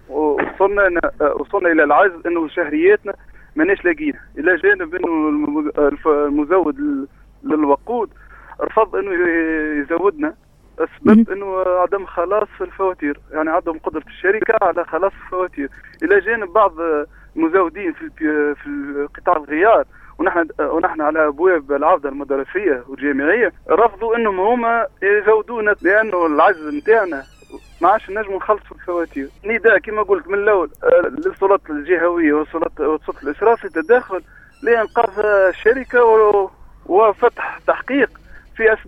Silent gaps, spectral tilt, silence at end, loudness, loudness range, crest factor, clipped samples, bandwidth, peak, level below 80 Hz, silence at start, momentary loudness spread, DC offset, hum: none; -7.5 dB/octave; 0 s; -17 LUFS; 4 LU; 16 dB; under 0.1%; 5 kHz; 0 dBFS; -46 dBFS; 0.1 s; 10 LU; under 0.1%; none